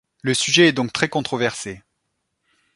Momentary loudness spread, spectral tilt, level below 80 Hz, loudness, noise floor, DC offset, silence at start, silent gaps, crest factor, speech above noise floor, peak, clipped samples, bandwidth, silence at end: 12 LU; -3.5 dB/octave; -58 dBFS; -19 LUFS; -75 dBFS; under 0.1%; 0.25 s; none; 20 dB; 55 dB; 0 dBFS; under 0.1%; 11.5 kHz; 1 s